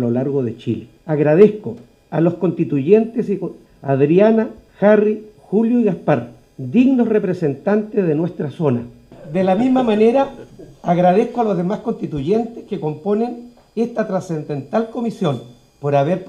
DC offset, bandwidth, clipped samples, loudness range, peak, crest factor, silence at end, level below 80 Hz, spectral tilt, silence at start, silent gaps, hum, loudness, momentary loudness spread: under 0.1%; 9.2 kHz; under 0.1%; 5 LU; 0 dBFS; 18 dB; 0 s; -54 dBFS; -9 dB/octave; 0 s; none; none; -18 LUFS; 13 LU